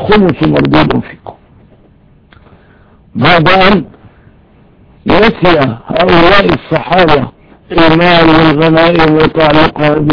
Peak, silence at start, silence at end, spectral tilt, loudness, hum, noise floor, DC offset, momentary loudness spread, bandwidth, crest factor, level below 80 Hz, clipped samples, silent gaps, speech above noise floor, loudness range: 0 dBFS; 0 s; 0 s; -7.5 dB/octave; -7 LUFS; none; -43 dBFS; 3%; 8 LU; 5.4 kHz; 10 dB; -28 dBFS; 1%; none; 36 dB; 5 LU